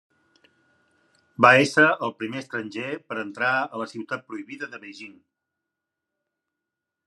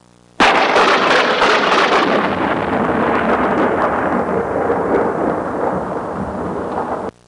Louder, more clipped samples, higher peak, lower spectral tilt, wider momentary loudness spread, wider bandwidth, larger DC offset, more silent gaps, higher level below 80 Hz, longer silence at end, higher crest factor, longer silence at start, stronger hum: second, -22 LUFS vs -15 LUFS; neither; about the same, -2 dBFS vs -4 dBFS; about the same, -4.5 dB/octave vs -4.5 dB/octave; first, 23 LU vs 10 LU; about the same, 12.5 kHz vs 11.5 kHz; neither; neither; second, -76 dBFS vs -44 dBFS; first, 1.95 s vs 0.2 s; first, 24 dB vs 12 dB; first, 1.4 s vs 0.4 s; neither